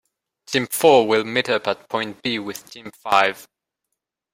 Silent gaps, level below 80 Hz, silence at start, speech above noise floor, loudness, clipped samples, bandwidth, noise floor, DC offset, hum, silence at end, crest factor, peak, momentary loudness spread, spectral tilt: none; -64 dBFS; 0.5 s; 60 dB; -20 LUFS; under 0.1%; 16.5 kHz; -80 dBFS; under 0.1%; none; 0.9 s; 20 dB; -2 dBFS; 19 LU; -3.5 dB/octave